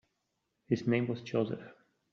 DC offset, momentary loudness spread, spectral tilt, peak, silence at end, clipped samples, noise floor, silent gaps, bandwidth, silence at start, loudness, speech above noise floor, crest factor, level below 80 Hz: under 0.1%; 7 LU; -7 dB/octave; -16 dBFS; 0.4 s; under 0.1%; -82 dBFS; none; 7 kHz; 0.7 s; -34 LUFS; 50 dB; 20 dB; -74 dBFS